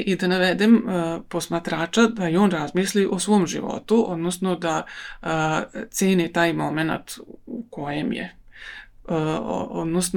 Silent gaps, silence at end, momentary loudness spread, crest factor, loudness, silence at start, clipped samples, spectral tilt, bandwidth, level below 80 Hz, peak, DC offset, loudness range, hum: none; 0 s; 16 LU; 18 dB; -23 LUFS; 0 s; under 0.1%; -5 dB/octave; 19 kHz; -52 dBFS; -4 dBFS; under 0.1%; 6 LU; none